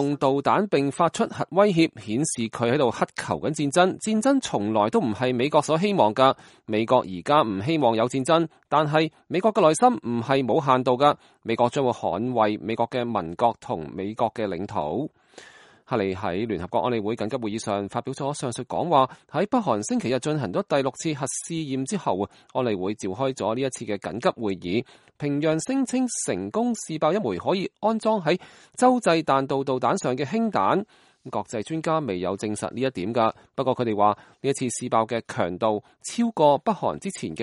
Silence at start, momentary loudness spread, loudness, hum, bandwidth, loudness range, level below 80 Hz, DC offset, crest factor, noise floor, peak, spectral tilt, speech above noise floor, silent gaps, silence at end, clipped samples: 0 s; 8 LU; -24 LUFS; none; 11.5 kHz; 6 LU; -62 dBFS; under 0.1%; 20 dB; -50 dBFS; -4 dBFS; -5 dB/octave; 27 dB; none; 0 s; under 0.1%